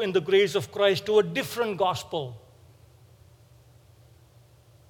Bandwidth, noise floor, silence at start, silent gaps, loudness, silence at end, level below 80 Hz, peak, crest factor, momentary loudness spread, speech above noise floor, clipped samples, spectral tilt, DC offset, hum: 19 kHz; -56 dBFS; 0 s; none; -25 LUFS; 2.5 s; -66 dBFS; -8 dBFS; 20 dB; 11 LU; 31 dB; under 0.1%; -4.5 dB/octave; under 0.1%; none